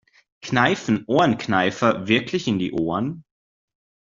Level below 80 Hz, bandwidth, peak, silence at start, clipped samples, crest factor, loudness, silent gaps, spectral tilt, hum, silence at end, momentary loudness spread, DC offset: -58 dBFS; 7.6 kHz; -2 dBFS; 0.45 s; under 0.1%; 20 dB; -21 LUFS; none; -5.5 dB/octave; none; 0.95 s; 8 LU; under 0.1%